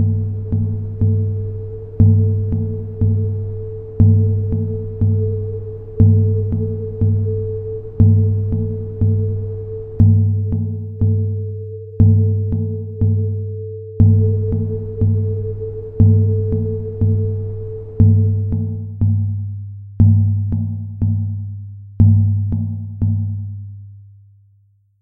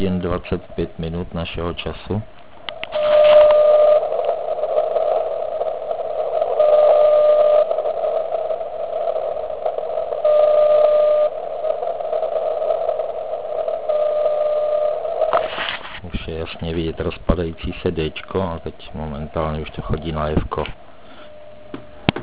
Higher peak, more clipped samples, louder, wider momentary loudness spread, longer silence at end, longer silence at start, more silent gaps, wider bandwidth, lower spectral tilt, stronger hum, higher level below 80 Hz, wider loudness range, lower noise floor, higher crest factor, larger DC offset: about the same, 0 dBFS vs 0 dBFS; neither; about the same, -18 LUFS vs -19 LUFS; about the same, 15 LU vs 14 LU; first, 0.9 s vs 0 s; about the same, 0 s vs 0 s; neither; second, 1.1 kHz vs 4 kHz; first, -15 dB/octave vs -10 dB/octave; neither; about the same, -34 dBFS vs -38 dBFS; second, 2 LU vs 9 LU; first, -55 dBFS vs -42 dBFS; about the same, 16 dB vs 18 dB; second, under 0.1% vs 1%